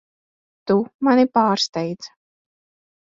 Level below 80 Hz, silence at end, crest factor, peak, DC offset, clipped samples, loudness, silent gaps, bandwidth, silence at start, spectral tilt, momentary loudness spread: -66 dBFS; 1.1 s; 18 dB; -4 dBFS; under 0.1%; under 0.1%; -19 LUFS; 0.94-0.99 s, 1.69-1.73 s; 7.6 kHz; 0.65 s; -5 dB/octave; 19 LU